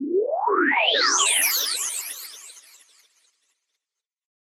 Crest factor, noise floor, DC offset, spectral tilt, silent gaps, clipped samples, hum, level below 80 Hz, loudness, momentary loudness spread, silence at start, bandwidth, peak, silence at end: 18 dB; -88 dBFS; under 0.1%; 2 dB/octave; none; under 0.1%; none; under -90 dBFS; -20 LUFS; 17 LU; 0 s; 16.5 kHz; -8 dBFS; 1.95 s